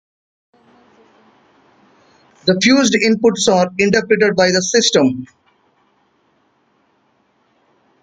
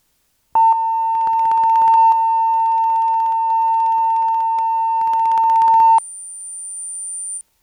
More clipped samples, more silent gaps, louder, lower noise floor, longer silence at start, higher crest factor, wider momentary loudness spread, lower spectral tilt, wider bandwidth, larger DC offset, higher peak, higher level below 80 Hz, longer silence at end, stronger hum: neither; neither; about the same, -14 LUFS vs -16 LUFS; second, -60 dBFS vs -64 dBFS; first, 2.45 s vs 0.55 s; first, 18 dB vs 10 dB; second, 6 LU vs 13 LU; first, -3.5 dB/octave vs 0 dB/octave; about the same, 9.6 kHz vs 9.8 kHz; neither; first, 0 dBFS vs -6 dBFS; first, -56 dBFS vs -66 dBFS; first, 2.8 s vs 0.2 s; neither